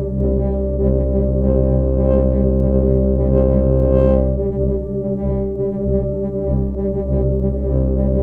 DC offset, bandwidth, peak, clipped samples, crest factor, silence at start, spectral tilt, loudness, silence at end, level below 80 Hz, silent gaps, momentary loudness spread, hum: under 0.1%; 2.8 kHz; -2 dBFS; under 0.1%; 14 dB; 0 s; -13 dB/octave; -17 LUFS; 0 s; -20 dBFS; none; 6 LU; none